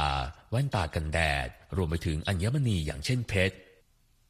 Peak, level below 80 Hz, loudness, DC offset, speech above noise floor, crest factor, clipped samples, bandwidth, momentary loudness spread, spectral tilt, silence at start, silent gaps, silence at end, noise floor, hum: -12 dBFS; -40 dBFS; -30 LUFS; under 0.1%; 36 dB; 18 dB; under 0.1%; 15 kHz; 6 LU; -5.5 dB/octave; 0 s; none; 0.7 s; -65 dBFS; none